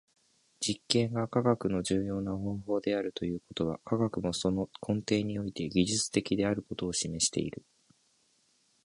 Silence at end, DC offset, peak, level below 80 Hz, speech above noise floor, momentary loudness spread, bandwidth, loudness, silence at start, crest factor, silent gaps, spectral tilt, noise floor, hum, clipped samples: 1.25 s; under 0.1%; -8 dBFS; -56 dBFS; 39 dB; 7 LU; 11.5 kHz; -31 LUFS; 0.6 s; 26 dB; none; -4.5 dB/octave; -71 dBFS; none; under 0.1%